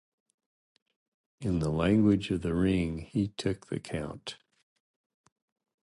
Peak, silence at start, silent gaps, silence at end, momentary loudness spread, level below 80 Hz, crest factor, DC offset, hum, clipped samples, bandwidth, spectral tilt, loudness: -12 dBFS; 1.4 s; none; 1.5 s; 13 LU; -50 dBFS; 18 dB; under 0.1%; none; under 0.1%; 11.5 kHz; -7 dB/octave; -30 LUFS